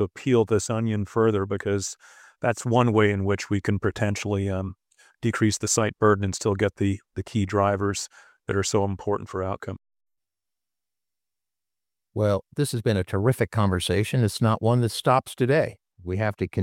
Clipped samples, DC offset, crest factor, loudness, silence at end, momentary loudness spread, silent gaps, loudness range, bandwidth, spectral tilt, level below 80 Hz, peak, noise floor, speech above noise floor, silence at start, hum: under 0.1%; under 0.1%; 20 dB; -24 LUFS; 0 s; 10 LU; none; 7 LU; 16 kHz; -5.5 dB/octave; -54 dBFS; -4 dBFS; -90 dBFS; 66 dB; 0 s; none